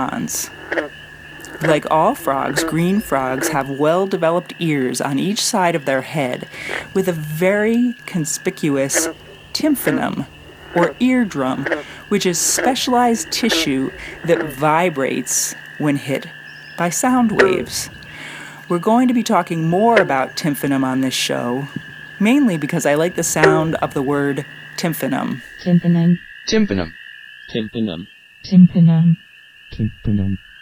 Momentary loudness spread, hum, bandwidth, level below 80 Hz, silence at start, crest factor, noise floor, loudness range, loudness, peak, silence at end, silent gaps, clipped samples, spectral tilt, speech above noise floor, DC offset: 12 LU; none; 16 kHz; -48 dBFS; 0 s; 18 dB; -38 dBFS; 3 LU; -18 LUFS; 0 dBFS; 0.25 s; none; under 0.1%; -4.5 dB/octave; 21 dB; under 0.1%